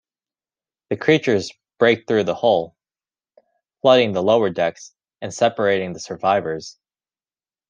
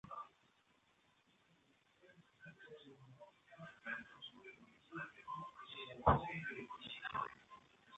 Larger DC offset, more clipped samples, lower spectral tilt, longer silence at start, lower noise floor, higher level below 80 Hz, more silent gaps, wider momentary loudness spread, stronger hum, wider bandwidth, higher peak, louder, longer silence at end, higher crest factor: neither; neither; second, -5 dB/octave vs -7 dB/octave; first, 0.9 s vs 0.05 s; first, under -90 dBFS vs -76 dBFS; second, -66 dBFS vs -60 dBFS; neither; second, 15 LU vs 25 LU; neither; first, 9.6 kHz vs 8.2 kHz; first, -2 dBFS vs -16 dBFS; first, -19 LUFS vs -44 LUFS; first, 1 s vs 0 s; second, 18 dB vs 30 dB